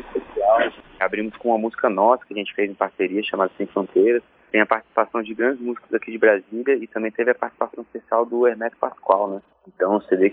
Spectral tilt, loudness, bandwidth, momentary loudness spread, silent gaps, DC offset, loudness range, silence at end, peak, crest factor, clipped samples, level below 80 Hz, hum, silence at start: -8.5 dB/octave; -22 LUFS; 3.9 kHz; 8 LU; none; under 0.1%; 2 LU; 0 s; 0 dBFS; 20 dB; under 0.1%; -62 dBFS; none; 0 s